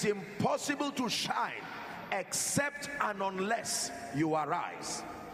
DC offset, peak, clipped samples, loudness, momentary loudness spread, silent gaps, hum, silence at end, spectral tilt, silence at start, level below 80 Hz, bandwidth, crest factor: under 0.1%; -16 dBFS; under 0.1%; -34 LUFS; 8 LU; none; none; 0 s; -3 dB/octave; 0 s; -68 dBFS; 15.5 kHz; 18 dB